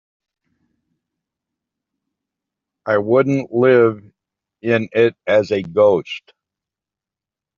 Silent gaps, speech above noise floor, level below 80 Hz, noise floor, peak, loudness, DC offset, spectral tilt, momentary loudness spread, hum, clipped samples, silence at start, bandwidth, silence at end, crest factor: none; 72 dB; -64 dBFS; -88 dBFS; -2 dBFS; -16 LUFS; under 0.1%; -5.5 dB/octave; 16 LU; none; under 0.1%; 2.85 s; 7.2 kHz; 1.4 s; 18 dB